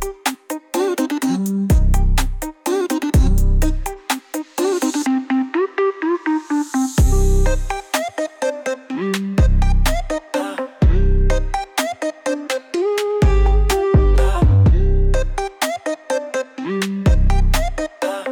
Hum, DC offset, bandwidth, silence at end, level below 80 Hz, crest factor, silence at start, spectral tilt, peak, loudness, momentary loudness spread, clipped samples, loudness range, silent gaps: none; under 0.1%; 18.5 kHz; 0 s; -18 dBFS; 12 dB; 0 s; -6 dB/octave; -4 dBFS; -19 LUFS; 9 LU; under 0.1%; 4 LU; none